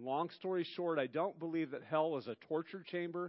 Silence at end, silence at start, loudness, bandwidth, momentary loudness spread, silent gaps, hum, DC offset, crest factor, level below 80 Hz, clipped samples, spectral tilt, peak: 0 s; 0 s; -39 LUFS; 5.6 kHz; 5 LU; none; none; under 0.1%; 18 dB; under -90 dBFS; under 0.1%; -4.5 dB/octave; -20 dBFS